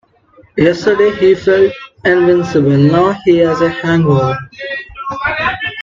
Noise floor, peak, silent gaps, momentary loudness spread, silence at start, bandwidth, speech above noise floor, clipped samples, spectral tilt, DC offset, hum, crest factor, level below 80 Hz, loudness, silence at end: -47 dBFS; 0 dBFS; none; 12 LU; 0.55 s; 7.4 kHz; 36 dB; under 0.1%; -7.5 dB/octave; under 0.1%; none; 12 dB; -44 dBFS; -12 LUFS; 0 s